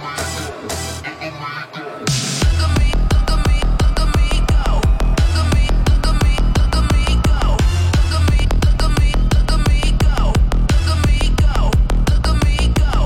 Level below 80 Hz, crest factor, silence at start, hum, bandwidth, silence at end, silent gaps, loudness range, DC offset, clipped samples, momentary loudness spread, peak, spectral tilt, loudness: -16 dBFS; 10 dB; 0 s; none; 13.5 kHz; 0 s; none; 2 LU; under 0.1%; under 0.1%; 8 LU; -2 dBFS; -5 dB/octave; -17 LUFS